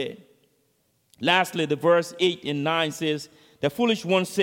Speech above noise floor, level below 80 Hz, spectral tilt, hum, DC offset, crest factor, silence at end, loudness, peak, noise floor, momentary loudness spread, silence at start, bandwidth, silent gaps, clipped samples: 45 dB; -70 dBFS; -4.5 dB/octave; none; under 0.1%; 20 dB; 0 s; -24 LUFS; -4 dBFS; -68 dBFS; 8 LU; 0 s; 17 kHz; none; under 0.1%